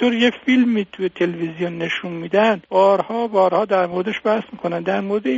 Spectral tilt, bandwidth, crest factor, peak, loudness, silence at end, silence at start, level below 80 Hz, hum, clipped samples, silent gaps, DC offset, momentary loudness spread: -3.5 dB/octave; 7.6 kHz; 16 dB; -2 dBFS; -19 LUFS; 0 s; 0 s; -62 dBFS; none; under 0.1%; none; under 0.1%; 8 LU